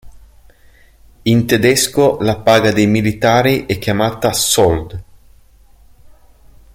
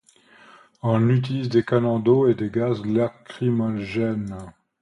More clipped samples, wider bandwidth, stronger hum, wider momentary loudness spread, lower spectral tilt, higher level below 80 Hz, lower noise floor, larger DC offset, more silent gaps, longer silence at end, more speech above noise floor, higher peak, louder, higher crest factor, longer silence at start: neither; first, 17 kHz vs 10 kHz; neither; about the same, 7 LU vs 9 LU; second, -4.5 dB/octave vs -9 dB/octave; first, -40 dBFS vs -56 dBFS; second, -46 dBFS vs -52 dBFS; neither; neither; first, 1.75 s vs 0.3 s; about the same, 33 dB vs 31 dB; first, 0 dBFS vs -6 dBFS; first, -13 LUFS vs -22 LUFS; about the same, 16 dB vs 18 dB; second, 0.05 s vs 0.85 s